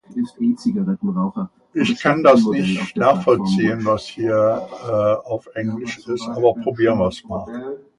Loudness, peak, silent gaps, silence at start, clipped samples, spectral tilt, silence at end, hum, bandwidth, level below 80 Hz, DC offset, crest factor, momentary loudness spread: -19 LUFS; 0 dBFS; none; 0.1 s; under 0.1%; -7 dB/octave; 0.2 s; none; 11 kHz; -52 dBFS; under 0.1%; 18 dB; 12 LU